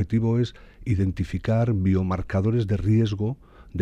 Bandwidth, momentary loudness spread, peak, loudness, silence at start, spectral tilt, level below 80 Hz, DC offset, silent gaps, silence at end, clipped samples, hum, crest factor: 7.6 kHz; 8 LU; -10 dBFS; -24 LUFS; 0 s; -9 dB/octave; -42 dBFS; under 0.1%; none; 0 s; under 0.1%; none; 14 dB